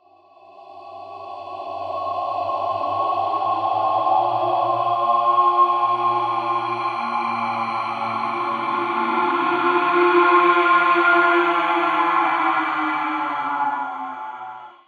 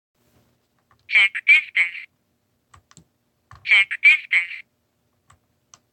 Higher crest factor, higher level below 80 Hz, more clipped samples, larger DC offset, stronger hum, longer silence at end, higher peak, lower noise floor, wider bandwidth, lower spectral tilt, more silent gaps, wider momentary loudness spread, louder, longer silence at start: about the same, 16 dB vs 18 dB; second, -88 dBFS vs -70 dBFS; neither; neither; neither; second, 0.15 s vs 1.3 s; about the same, -4 dBFS vs -4 dBFS; second, -50 dBFS vs -69 dBFS; about the same, 9.4 kHz vs 9 kHz; first, -5.5 dB/octave vs 1 dB/octave; neither; second, 15 LU vs 18 LU; second, -19 LUFS vs -16 LUFS; second, 0.55 s vs 1.1 s